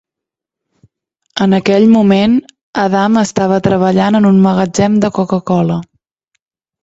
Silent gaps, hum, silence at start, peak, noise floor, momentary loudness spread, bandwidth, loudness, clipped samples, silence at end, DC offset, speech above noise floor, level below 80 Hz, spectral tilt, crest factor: 2.63-2.73 s; none; 1.35 s; 0 dBFS; -83 dBFS; 8 LU; 8 kHz; -11 LUFS; under 0.1%; 1 s; under 0.1%; 73 dB; -48 dBFS; -6.5 dB/octave; 12 dB